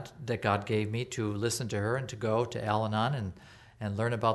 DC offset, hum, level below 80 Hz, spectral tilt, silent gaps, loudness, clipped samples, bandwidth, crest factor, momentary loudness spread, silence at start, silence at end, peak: under 0.1%; none; -62 dBFS; -5.5 dB/octave; none; -32 LUFS; under 0.1%; 12 kHz; 20 dB; 7 LU; 0 s; 0 s; -12 dBFS